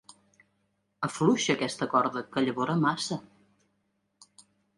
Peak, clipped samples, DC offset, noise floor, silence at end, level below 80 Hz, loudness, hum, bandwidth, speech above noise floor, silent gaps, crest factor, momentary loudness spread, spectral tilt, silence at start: -10 dBFS; under 0.1%; under 0.1%; -76 dBFS; 1.55 s; -72 dBFS; -28 LUFS; none; 11.5 kHz; 48 dB; none; 20 dB; 9 LU; -4.5 dB/octave; 1 s